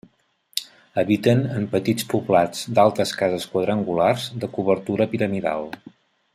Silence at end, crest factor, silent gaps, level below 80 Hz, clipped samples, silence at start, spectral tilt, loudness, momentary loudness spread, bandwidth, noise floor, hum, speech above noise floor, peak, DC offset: 0.6 s; 22 dB; none; -62 dBFS; under 0.1%; 0.55 s; -6 dB/octave; -22 LUFS; 11 LU; 15.5 kHz; -62 dBFS; none; 41 dB; 0 dBFS; under 0.1%